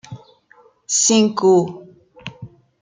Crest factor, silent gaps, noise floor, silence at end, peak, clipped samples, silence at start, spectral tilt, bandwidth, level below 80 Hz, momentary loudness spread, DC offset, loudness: 16 dB; none; -53 dBFS; 0.35 s; -4 dBFS; under 0.1%; 0.1 s; -3.5 dB/octave; 9.6 kHz; -62 dBFS; 22 LU; under 0.1%; -16 LUFS